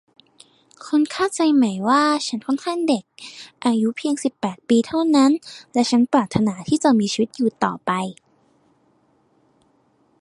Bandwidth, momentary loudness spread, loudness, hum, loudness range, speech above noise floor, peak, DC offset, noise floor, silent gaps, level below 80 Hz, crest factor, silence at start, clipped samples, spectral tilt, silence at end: 11.5 kHz; 8 LU; -20 LUFS; none; 4 LU; 42 dB; -2 dBFS; under 0.1%; -61 dBFS; none; -60 dBFS; 20 dB; 0.8 s; under 0.1%; -5 dB/octave; 2.1 s